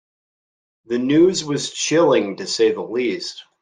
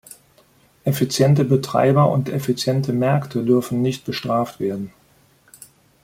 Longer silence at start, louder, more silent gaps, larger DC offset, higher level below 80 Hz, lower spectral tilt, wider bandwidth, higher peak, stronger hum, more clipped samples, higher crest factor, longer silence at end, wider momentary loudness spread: about the same, 0.9 s vs 0.85 s; about the same, -19 LUFS vs -20 LUFS; neither; neither; second, -64 dBFS vs -58 dBFS; second, -4 dB/octave vs -6.5 dB/octave; second, 10 kHz vs 16.5 kHz; about the same, -4 dBFS vs -4 dBFS; neither; neither; about the same, 16 dB vs 16 dB; second, 0.2 s vs 1.15 s; about the same, 10 LU vs 10 LU